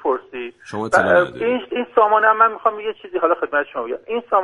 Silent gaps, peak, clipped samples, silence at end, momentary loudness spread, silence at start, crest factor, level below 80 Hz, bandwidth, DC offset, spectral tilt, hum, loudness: none; 0 dBFS; under 0.1%; 0 s; 14 LU; 0.05 s; 18 dB; -60 dBFS; 11.5 kHz; under 0.1%; -5 dB/octave; none; -18 LUFS